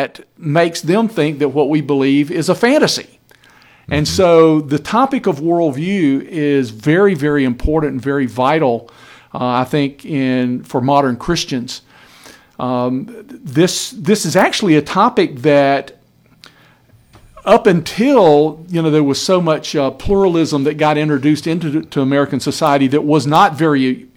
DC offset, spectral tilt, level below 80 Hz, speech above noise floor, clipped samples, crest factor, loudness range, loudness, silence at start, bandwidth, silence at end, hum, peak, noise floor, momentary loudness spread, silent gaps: under 0.1%; -5.5 dB/octave; -40 dBFS; 35 dB; under 0.1%; 14 dB; 4 LU; -14 LUFS; 0 s; 17 kHz; 0.15 s; none; 0 dBFS; -49 dBFS; 8 LU; none